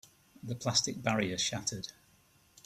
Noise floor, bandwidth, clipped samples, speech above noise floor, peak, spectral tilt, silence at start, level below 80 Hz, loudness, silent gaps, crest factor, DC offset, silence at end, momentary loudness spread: -66 dBFS; 15 kHz; under 0.1%; 32 dB; -12 dBFS; -3 dB/octave; 0.45 s; -66 dBFS; -33 LUFS; none; 24 dB; under 0.1%; 0.75 s; 14 LU